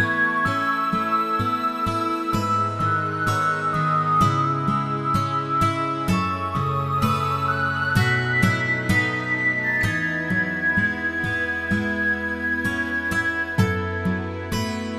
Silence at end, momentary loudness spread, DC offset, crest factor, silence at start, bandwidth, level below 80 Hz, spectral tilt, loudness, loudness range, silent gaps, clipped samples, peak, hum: 0 s; 4 LU; under 0.1%; 18 dB; 0 s; 14 kHz; -44 dBFS; -6 dB/octave; -22 LUFS; 2 LU; none; under 0.1%; -4 dBFS; none